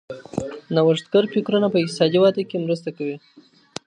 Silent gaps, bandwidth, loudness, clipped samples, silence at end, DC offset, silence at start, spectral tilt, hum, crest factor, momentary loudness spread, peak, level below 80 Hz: none; 10.5 kHz; -21 LUFS; under 0.1%; 0.45 s; under 0.1%; 0.1 s; -6.5 dB/octave; none; 18 dB; 13 LU; -4 dBFS; -60 dBFS